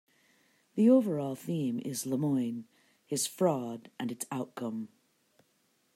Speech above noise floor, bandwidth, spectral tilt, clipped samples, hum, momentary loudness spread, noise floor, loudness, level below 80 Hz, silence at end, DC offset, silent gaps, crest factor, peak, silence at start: 42 dB; 16 kHz; -5.5 dB/octave; under 0.1%; none; 16 LU; -73 dBFS; -32 LUFS; -80 dBFS; 1.1 s; under 0.1%; none; 18 dB; -14 dBFS; 0.75 s